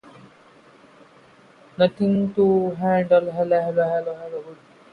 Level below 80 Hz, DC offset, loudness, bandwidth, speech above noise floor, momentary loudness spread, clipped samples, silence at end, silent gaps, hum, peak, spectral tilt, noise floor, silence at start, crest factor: -62 dBFS; under 0.1%; -21 LUFS; 5.2 kHz; 31 dB; 14 LU; under 0.1%; 0.4 s; none; none; -6 dBFS; -9 dB/octave; -52 dBFS; 1.8 s; 18 dB